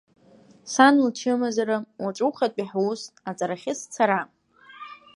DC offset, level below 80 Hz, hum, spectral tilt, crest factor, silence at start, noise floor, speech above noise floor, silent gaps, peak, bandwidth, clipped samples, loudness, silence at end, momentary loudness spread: under 0.1%; -76 dBFS; none; -4 dB/octave; 22 dB; 0.65 s; -54 dBFS; 31 dB; none; -2 dBFS; 11.5 kHz; under 0.1%; -24 LUFS; 0.2 s; 22 LU